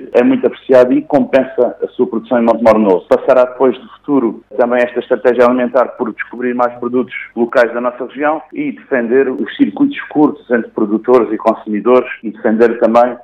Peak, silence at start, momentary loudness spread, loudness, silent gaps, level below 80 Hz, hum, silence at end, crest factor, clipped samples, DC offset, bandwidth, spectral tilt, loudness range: 0 dBFS; 0 s; 9 LU; -13 LUFS; none; -56 dBFS; none; 0.05 s; 12 dB; 0.6%; under 0.1%; 8.6 kHz; -7.5 dB/octave; 4 LU